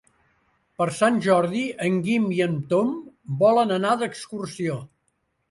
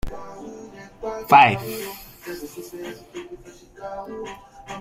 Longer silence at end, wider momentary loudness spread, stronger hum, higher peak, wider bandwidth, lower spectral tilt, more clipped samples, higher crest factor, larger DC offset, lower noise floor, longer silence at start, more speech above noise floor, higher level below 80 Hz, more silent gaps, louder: first, 0.65 s vs 0 s; second, 13 LU vs 26 LU; neither; second, -8 dBFS vs -2 dBFS; second, 11.5 kHz vs 16 kHz; first, -6 dB/octave vs -4.5 dB/octave; neither; second, 16 dB vs 22 dB; neither; first, -72 dBFS vs -43 dBFS; first, 0.8 s vs 0.05 s; first, 50 dB vs 23 dB; second, -66 dBFS vs -46 dBFS; neither; second, -23 LUFS vs -18 LUFS